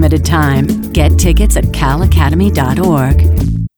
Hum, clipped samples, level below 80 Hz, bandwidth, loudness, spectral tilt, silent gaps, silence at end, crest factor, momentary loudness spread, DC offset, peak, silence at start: none; under 0.1%; -14 dBFS; 19.5 kHz; -11 LUFS; -6 dB/octave; none; 0.1 s; 8 dB; 3 LU; under 0.1%; 0 dBFS; 0 s